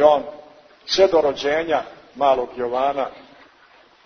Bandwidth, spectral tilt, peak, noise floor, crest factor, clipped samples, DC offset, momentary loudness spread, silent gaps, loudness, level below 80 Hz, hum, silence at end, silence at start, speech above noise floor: 6.6 kHz; -3.5 dB/octave; -2 dBFS; -52 dBFS; 20 dB; under 0.1%; under 0.1%; 15 LU; none; -20 LUFS; -56 dBFS; none; 0.85 s; 0 s; 33 dB